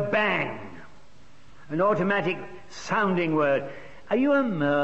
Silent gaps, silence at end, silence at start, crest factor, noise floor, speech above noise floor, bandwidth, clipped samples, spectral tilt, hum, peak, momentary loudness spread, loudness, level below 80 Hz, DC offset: none; 0 s; 0 s; 14 dB; -55 dBFS; 31 dB; 8.2 kHz; under 0.1%; -6.5 dB/octave; none; -12 dBFS; 17 LU; -25 LUFS; -62 dBFS; 0.8%